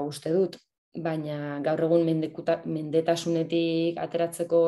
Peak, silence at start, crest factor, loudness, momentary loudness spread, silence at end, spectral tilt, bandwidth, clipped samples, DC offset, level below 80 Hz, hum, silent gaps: -10 dBFS; 0 s; 16 dB; -27 LUFS; 8 LU; 0 s; -6.5 dB/octave; 12.5 kHz; under 0.1%; under 0.1%; -72 dBFS; none; 0.78-0.92 s